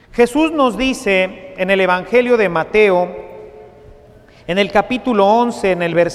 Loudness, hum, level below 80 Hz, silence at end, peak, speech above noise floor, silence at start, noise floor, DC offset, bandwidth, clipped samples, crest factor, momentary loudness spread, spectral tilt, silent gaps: -15 LUFS; none; -44 dBFS; 0 s; 0 dBFS; 29 dB; 0.15 s; -44 dBFS; under 0.1%; 13.5 kHz; under 0.1%; 16 dB; 9 LU; -5 dB/octave; none